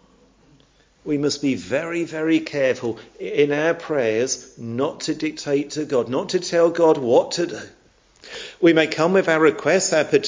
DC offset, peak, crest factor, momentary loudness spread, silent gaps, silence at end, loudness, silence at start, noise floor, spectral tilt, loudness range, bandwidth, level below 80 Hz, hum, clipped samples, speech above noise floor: under 0.1%; -2 dBFS; 18 dB; 11 LU; none; 0 s; -20 LUFS; 1.05 s; -56 dBFS; -4.5 dB/octave; 4 LU; 7.6 kHz; -60 dBFS; none; under 0.1%; 36 dB